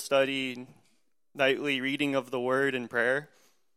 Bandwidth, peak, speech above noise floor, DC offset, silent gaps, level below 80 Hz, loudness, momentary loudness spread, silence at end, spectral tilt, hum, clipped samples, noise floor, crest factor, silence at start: 15 kHz; -12 dBFS; 45 dB; under 0.1%; none; -76 dBFS; -28 LUFS; 7 LU; 0.5 s; -4 dB/octave; none; under 0.1%; -73 dBFS; 18 dB; 0 s